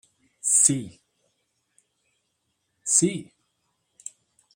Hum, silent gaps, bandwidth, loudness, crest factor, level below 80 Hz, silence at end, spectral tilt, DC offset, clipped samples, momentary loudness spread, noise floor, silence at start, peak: none; none; 16 kHz; -20 LUFS; 26 dB; -70 dBFS; 1.35 s; -3 dB/octave; under 0.1%; under 0.1%; 24 LU; -76 dBFS; 0.45 s; -2 dBFS